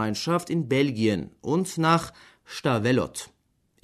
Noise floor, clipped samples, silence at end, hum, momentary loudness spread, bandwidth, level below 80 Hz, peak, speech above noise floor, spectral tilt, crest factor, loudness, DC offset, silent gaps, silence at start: -67 dBFS; under 0.1%; 0.55 s; none; 15 LU; 13.5 kHz; -58 dBFS; -8 dBFS; 42 dB; -5.5 dB/octave; 18 dB; -25 LUFS; under 0.1%; none; 0 s